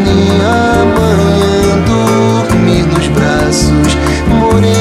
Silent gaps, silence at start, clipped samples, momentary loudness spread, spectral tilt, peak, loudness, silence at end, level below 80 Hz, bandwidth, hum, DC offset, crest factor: none; 0 s; under 0.1%; 2 LU; -6 dB/octave; 0 dBFS; -9 LUFS; 0 s; -22 dBFS; 15.5 kHz; none; under 0.1%; 8 dB